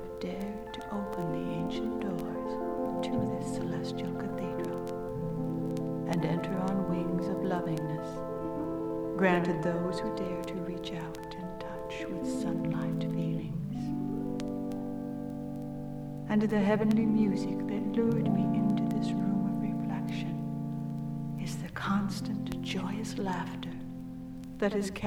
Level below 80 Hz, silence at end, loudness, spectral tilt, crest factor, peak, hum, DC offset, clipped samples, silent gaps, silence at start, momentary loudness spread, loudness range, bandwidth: -54 dBFS; 0 s; -33 LUFS; -7 dB/octave; 20 dB; -12 dBFS; none; under 0.1%; under 0.1%; none; 0 s; 10 LU; 6 LU; 19.5 kHz